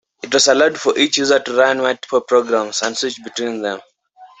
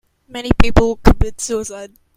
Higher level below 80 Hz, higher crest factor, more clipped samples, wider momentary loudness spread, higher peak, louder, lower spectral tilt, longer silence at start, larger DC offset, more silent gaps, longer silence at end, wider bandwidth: second, -64 dBFS vs -20 dBFS; about the same, 16 dB vs 14 dB; second, under 0.1% vs 0.2%; second, 11 LU vs 16 LU; about the same, -2 dBFS vs 0 dBFS; about the same, -16 LUFS vs -16 LUFS; second, -1.5 dB/octave vs -5.5 dB/octave; about the same, 0.25 s vs 0.35 s; neither; neither; second, 0.15 s vs 0.3 s; second, 8.4 kHz vs 15 kHz